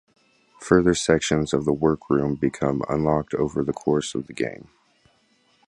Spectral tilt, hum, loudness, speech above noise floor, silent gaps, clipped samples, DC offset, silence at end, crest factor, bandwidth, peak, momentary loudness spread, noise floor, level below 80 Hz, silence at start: -5.5 dB/octave; none; -23 LUFS; 41 dB; none; under 0.1%; under 0.1%; 1.15 s; 20 dB; 11.5 kHz; -2 dBFS; 10 LU; -63 dBFS; -46 dBFS; 0.6 s